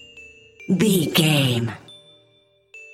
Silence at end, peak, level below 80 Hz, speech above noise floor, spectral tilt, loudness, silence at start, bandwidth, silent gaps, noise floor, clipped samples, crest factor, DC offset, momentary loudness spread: 0.1 s; -4 dBFS; -60 dBFS; 41 dB; -5 dB/octave; -19 LUFS; 0.15 s; 16.5 kHz; none; -60 dBFS; under 0.1%; 20 dB; under 0.1%; 23 LU